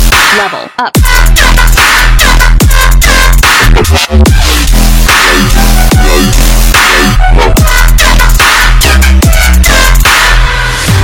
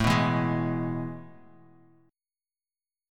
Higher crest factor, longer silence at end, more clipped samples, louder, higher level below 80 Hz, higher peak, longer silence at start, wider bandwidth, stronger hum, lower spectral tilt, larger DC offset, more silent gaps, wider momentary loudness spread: second, 4 dB vs 22 dB; second, 0 s vs 1.8 s; first, 10% vs under 0.1%; first, -5 LUFS vs -28 LUFS; first, -6 dBFS vs -50 dBFS; first, 0 dBFS vs -8 dBFS; about the same, 0 s vs 0 s; first, over 20 kHz vs 16.5 kHz; neither; second, -3.5 dB/octave vs -6.5 dB/octave; neither; neither; second, 3 LU vs 14 LU